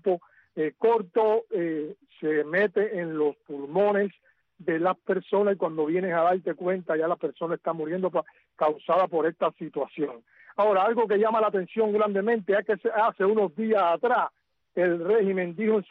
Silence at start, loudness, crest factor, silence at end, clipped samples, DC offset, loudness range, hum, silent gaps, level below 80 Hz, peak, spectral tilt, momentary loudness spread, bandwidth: 0.05 s; -26 LUFS; 12 dB; 0.05 s; under 0.1%; under 0.1%; 3 LU; none; none; -74 dBFS; -12 dBFS; -9 dB/octave; 8 LU; 4.7 kHz